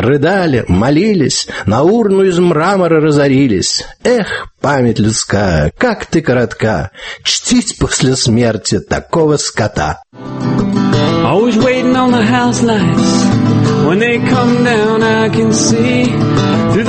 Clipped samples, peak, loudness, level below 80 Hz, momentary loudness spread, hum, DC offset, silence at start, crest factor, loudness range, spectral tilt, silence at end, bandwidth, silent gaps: under 0.1%; 0 dBFS; -12 LUFS; -34 dBFS; 5 LU; none; under 0.1%; 0 s; 12 dB; 3 LU; -5 dB/octave; 0 s; 8.8 kHz; none